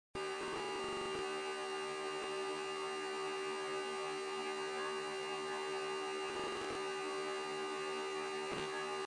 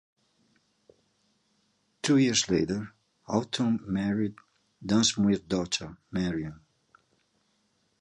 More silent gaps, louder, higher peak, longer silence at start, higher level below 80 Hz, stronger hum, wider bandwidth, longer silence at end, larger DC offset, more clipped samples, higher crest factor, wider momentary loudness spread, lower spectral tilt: neither; second, -41 LUFS vs -28 LUFS; second, -26 dBFS vs -10 dBFS; second, 0.15 s vs 2.05 s; second, -74 dBFS vs -58 dBFS; neither; about the same, 11.5 kHz vs 11 kHz; second, 0 s vs 1.45 s; neither; neither; second, 14 dB vs 20 dB; second, 1 LU vs 12 LU; second, -2.5 dB/octave vs -4.5 dB/octave